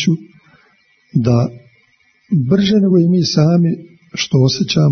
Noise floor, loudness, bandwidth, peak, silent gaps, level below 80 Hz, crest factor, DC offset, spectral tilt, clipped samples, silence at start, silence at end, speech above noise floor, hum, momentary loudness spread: -56 dBFS; -14 LUFS; 6.6 kHz; 0 dBFS; none; -50 dBFS; 14 dB; under 0.1%; -6.5 dB/octave; under 0.1%; 0 s; 0 s; 43 dB; none; 10 LU